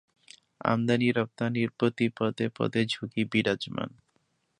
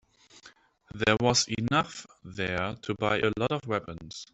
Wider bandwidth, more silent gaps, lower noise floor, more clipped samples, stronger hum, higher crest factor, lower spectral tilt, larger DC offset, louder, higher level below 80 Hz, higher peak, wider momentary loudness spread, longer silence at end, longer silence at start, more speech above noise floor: first, 10.5 kHz vs 8.2 kHz; neither; first, -73 dBFS vs -57 dBFS; neither; neither; about the same, 22 dB vs 22 dB; first, -6.5 dB/octave vs -4 dB/octave; neither; about the same, -28 LUFS vs -28 LUFS; second, -66 dBFS vs -58 dBFS; about the same, -6 dBFS vs -8 dBFS; second, 7 LU vs 17 LU; first, 0.7 s vs 0.1 s; first, 0.65 s vs 0.35 s; first, 45 dB vs 28 dB